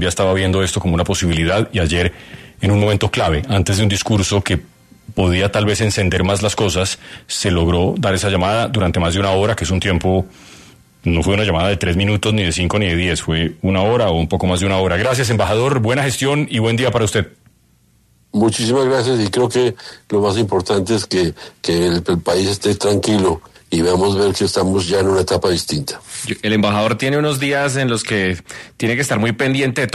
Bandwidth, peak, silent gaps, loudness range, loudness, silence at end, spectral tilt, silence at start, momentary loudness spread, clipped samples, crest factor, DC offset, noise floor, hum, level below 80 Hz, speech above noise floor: 13.5 kHz; -2 dBFS; none; 1 LU; -17 LUFS; 0 s; -5 dB/octave; 0 s; 6 LU; under 0.1%; 16 dB; under 0.1%; -55 dBFS; none; -36 dBFS; 39 dB